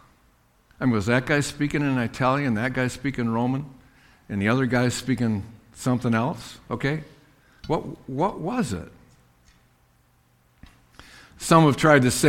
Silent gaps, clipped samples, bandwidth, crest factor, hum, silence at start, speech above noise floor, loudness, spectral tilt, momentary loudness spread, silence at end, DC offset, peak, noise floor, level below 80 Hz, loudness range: none; under 0.1%; 16.5 kHz; 22 dB; none; 0.8 s; 39 dB; -24 LUFS; -5.5 dB/octave; 16 LU; 0 s; under 0.1%; -2 dBFS; -62 dBFS; -50 dBFS; 7 LU